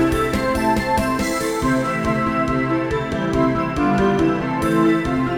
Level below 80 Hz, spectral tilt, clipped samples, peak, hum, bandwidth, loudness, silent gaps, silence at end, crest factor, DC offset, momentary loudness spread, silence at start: -36 dBFS; -6 dB/octave; under 0.1%; -4 dBFS; none; over 20 kHz; -19 LUFS; none; 0 s; 14 dB; 0.3%; 4 LU; 0 s